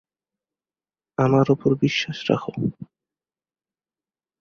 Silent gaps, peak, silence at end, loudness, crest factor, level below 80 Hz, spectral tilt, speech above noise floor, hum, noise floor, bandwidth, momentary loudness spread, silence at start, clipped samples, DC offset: none; -4 dBFS; 1.55 s; -22 LUFS; 22 dB; -58 dBFS; -6.5 dB/octave; over 69 dB; none; under -90 dBFS; 7 kHz; 10 LU; 1.2 s; under 0.1%; under 0.1%